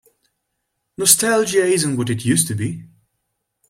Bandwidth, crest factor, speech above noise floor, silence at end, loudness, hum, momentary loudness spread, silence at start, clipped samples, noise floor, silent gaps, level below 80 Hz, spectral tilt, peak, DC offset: 16.5 kHz; 20 dB; 57 dB; 0.85 s; -17 LUFS; none; 12 LU; 1 s; under 0.1%; -75 dBFS; none; -58 dBFS; -3.5 dB/octave; 0 dBFS; under 0.1%